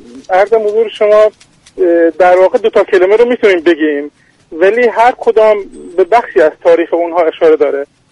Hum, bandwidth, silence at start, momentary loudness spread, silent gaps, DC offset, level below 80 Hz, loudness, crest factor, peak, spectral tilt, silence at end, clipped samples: none; 10.5 kHz; 0.15 s; 7 LU; none; under 0.1%; -50 dBFS; -10 LUFS; 10 dB; 0 dBFS; -5 dB/octave; 0.25 s; 0.1%